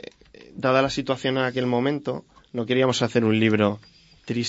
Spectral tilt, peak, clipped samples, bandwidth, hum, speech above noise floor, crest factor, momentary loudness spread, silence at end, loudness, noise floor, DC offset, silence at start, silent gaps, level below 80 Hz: -5.5 dB/octave; -6 dBFS; under 0.1%; 8 kHz; none; 23 dB; 18 dB; 15 LU; 0 s; -23 LUFS; -46 dBFS; under 0.1%; 0.4 s; none; -58 dBFS